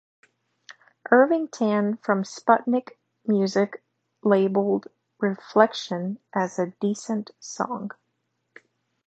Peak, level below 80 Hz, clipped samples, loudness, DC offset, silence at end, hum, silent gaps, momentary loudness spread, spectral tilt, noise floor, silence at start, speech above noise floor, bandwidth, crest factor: -2 dBFS; -78 dBFS; under 0.1%; -24 LUFS; under 0.1%; 1.15 s; none; none; 10 LU; -6 dB/octave; -76 dBFS; 0.7 s; 53 dB; 8.2 kHz; 22 dB